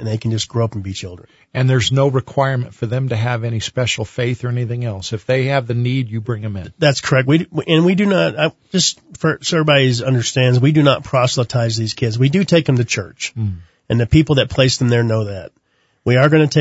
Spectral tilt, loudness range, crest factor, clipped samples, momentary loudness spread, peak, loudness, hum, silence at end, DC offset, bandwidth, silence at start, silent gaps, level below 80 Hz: -5.5 dB/octave; 4 LU; 16 dB; under 0.1%; 10 LU; 0 dBFS; -16 LUFS; none; 0 s; under 0.1%; 8 kHz; 0 s; none; -44 dBFS